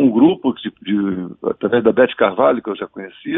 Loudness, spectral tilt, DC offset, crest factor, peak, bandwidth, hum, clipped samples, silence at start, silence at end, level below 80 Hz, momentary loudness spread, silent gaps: -17 LUFS; -11 dB/octave; under 0.1%; 16 dB; 0 dBFS; 3.9 kHz; none; under 0.1%; 0 s; 0 s; -58 dBFS; 13 LU; none